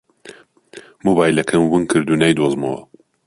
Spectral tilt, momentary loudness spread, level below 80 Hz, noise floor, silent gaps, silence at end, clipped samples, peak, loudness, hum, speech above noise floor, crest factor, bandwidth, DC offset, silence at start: -5.5 dB/octave; 8 LU; -52 dBFS; -43 dBFS; none; 0.45 s; under 0.1%; -2 dBFS; -16 LUFS; none; 27 dB; 16 dB; 11.5 kHz; under 0.1%; 0.25 s